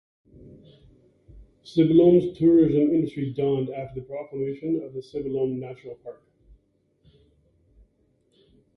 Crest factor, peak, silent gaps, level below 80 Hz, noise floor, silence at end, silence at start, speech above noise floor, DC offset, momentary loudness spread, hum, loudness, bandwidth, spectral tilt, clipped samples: 18 dB; -6 dBFS; none; -56 dBFS; -66 dBFS; 2.65 s; 0.45 s; 44 dB; under 0.1%; 19 LU; none; -23 LUFS; 5.8 kHz; -10 dB/octave; under 0.1%